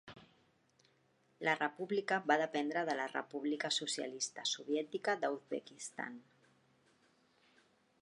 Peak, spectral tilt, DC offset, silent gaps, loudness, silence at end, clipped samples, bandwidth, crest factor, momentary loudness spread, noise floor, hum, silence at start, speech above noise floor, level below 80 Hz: -16 dBFS; -2.5 dB/octave; under 0.1%; none; -38 LUFS; 1.8 s; under 0.1%; 11 kHz; 24 dB; 11 LU; -74 dBFS; none; 0.05 s; 36 dB; -88 dBFS